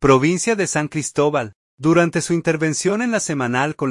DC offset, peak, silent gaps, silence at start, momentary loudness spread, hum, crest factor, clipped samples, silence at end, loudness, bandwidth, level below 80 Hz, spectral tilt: under 0.1%; -2 dBFS; 1.55-1.78 s; 0 s; 6 LU; none; 16 dB; under 0.1%; 0 s; -19 LUFS; 11.5 kHz; -48 dBFS; -5 dB/octave